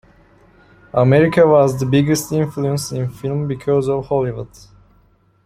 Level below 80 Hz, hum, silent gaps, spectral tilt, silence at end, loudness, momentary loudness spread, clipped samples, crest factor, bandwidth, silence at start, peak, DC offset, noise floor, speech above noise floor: -48 dBFS; none; none; -6.5 dB/octave; 1 s; -17 LUFS; 12 LU; under 0.1%; 16 dB; 16 kHz; 0.95 s; -2 dBFS; under 0.1%; -55 dBFS; 39 dB